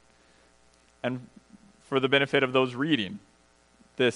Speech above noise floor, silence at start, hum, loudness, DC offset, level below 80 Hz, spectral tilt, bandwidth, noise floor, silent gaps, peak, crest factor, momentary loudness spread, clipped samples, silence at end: 36 dB; 1.05 s; none; -26 LUFS; under 0.1%; -70 dBFS; -5.5 dB/octave; 10.5 kHz; -62 dBFS; none; -8 dBFS; 20 dB; 16 LU; under 0.1%; 0 s